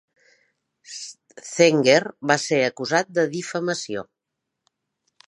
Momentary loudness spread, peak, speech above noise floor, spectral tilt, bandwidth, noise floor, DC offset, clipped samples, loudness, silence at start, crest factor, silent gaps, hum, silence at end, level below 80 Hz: 18 LU; 0 dBFS; 61 dB; -4 dB/octave; 11 kHz; -82 dBFS; under 0.1%; under 0.1%; -21 LUFS; 0.9 s; 24 dB; none; none; 1.25 s; -72 dBFS